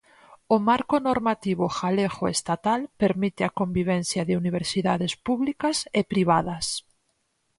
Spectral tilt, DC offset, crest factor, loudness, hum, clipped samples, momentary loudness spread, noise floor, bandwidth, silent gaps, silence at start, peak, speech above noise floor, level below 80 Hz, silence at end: -5 dB/octave; under 0.1%; 18 dB; -25 LUFS; none; under 0.1%; 5 LU; -72 dBFS; 11.5 kHz; none; 0.3 s; -8 dBFS; 48 dB; -56 dBFS; 0.8 s